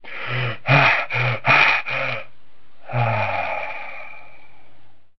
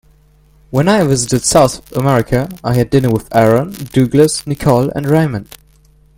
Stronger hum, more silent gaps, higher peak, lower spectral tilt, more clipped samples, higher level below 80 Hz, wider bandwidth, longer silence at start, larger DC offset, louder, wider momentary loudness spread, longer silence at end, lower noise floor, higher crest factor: neither; neither; about the same, -2 dBFS vs 0 dBFS; about the same, -6 dB/octave vs -5.5 dB/octave; neither; second, -56 dBFS vs -38 dBFS; second, 6.2 kHz vs 17 kHz; second, 0 s vs 0.7 s; first, 3% vs under 0.1%; second, -19 LUFS vs -13 LUFS; first, 18 LU vs 6 LU; second, 0 s vs 0.75 s; first, -58 dBFS vs -48 dBFS; first, 20 dB vs 14 dB